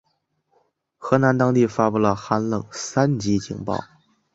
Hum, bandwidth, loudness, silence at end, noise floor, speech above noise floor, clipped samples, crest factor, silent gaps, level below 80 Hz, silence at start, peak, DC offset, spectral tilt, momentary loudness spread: none; 8 kHz; -21 LUFS; 0.5 s; -71 dBFS; 50 dB; under 0.1%; 20 dB; none; -54 dBFS; 1 s; -2 dBFS; under 0.1%; -6.5 dB/octave; 10 LU